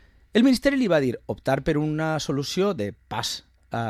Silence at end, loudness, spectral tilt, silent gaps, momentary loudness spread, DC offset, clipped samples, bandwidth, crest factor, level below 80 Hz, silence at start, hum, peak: 0 s; -24 LUFS; -5.5 dB/octave; none; 10 LU; under 0.1%; under 0.1%; 14.5 kHz; 18 dB; -48 dBFS; 0.35 s; none; -6 dBFS